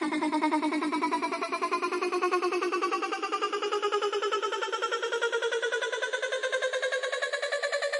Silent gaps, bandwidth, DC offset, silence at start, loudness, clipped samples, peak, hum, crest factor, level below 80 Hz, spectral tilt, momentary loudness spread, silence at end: none; 11.5 kHz; under 0.1%; 0 s; -29 LUFS; under 0.1%; -14 dBFS; none; 16 dB; -88 dBFS; -1.5 dB/octave; 3 LU; 0 s